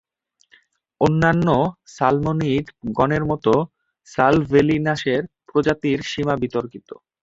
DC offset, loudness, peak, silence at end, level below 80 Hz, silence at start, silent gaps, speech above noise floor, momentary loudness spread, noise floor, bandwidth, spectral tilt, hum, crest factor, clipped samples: under 0.1%; -20 LUFS; -2 dBFS; 0.3 s; -46 dBFS; 1 s; none; 45 dB; 9 LU; -64 dBFS; 7.8 kHz; -7 dB/octave; none; 20 dB; under 0.1%